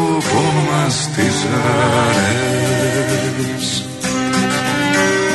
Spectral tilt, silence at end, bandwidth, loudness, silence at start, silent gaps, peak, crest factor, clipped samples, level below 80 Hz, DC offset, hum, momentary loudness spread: -4.5 dB/octave; 0 s; 12.5 kHz; -16 LUFS; 0 s; none; -2 dBFS; 14 dB; under 0.1%; -46 dBFS; under 0.1%; none; 6 LU